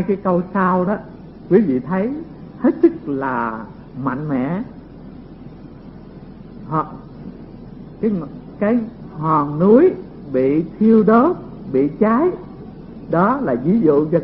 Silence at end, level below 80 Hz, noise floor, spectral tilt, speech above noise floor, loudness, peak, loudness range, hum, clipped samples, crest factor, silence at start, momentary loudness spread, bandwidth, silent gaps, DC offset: 0 s; -46 dBFS; -37 dBFS; -13.5 dB/octave; 21 dB; -18 LUFS; 0 dBFS; 12 LU; none; under 0.1%; 18 dB; 0 s; 24 LU; 5.4 kHz; none; under 0.1%